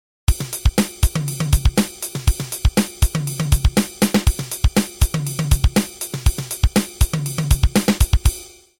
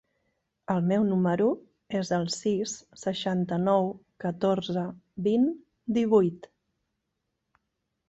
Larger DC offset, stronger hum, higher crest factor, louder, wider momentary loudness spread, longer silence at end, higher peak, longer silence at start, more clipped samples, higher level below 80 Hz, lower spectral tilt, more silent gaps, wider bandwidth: first, 0.1% vs under 0.1%; neither; about the same, 16 dB vs 18 dB; first, -20 LUFS vs -28 LUFS; second, 5 LU vs 11 LU; second, 0.3 s vs 1.7 s; first, -2 dBFS vs -10 dBFS; second, 0.3 s vs 0.7 s; neither; first, -22 dBFS vs -66 dBFS; second, -5 dB/octave vs -6.5 dB/octave; neither; first, 18.5 kHz vs 8.2 kHz